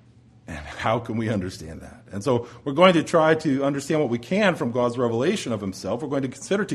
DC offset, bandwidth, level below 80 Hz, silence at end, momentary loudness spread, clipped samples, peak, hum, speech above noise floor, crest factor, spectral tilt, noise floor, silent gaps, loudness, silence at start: under 0.1%; 13 kHz; -54 dBFS; 0 s; 18 LU; under 0.1%; -2 dBFS; none; 24 dB; 20 dB; -5.5 dB/octave; -47 dBFS; none; -23 LUFS; 0.5 s